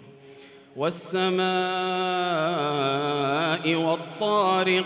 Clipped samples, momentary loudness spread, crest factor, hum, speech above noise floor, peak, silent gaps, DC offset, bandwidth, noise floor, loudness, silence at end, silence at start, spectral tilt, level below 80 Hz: under 0.1%; 6 LU; 14 dB; none; 24 dB; -10 dBFS; none; under 0.1%; 4 kHz; -48 dBFS; -25 LUFS; 0 s; 0 s; -9.5 dB/octave; -74 dBFS